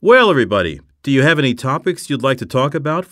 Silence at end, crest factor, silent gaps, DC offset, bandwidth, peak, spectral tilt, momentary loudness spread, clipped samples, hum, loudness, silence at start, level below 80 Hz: 0.05 s; 14 dB; none; under 0.1%; 14.5 kHz; 0 dBFS; -6 dB/octave; 9 LU; under 0.1%; none; -16 LUFS; 0 s; -48 dBFS